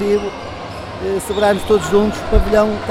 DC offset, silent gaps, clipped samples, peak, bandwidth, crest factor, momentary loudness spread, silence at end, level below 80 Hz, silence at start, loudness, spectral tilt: under 0.1%; none; under 0.1%; 0 dBFS; 15.5 kHz; 16 dB; 14 LU; 0 s; -24 dBFS; 0 s; -16 LUFS; -5.5 dB/octave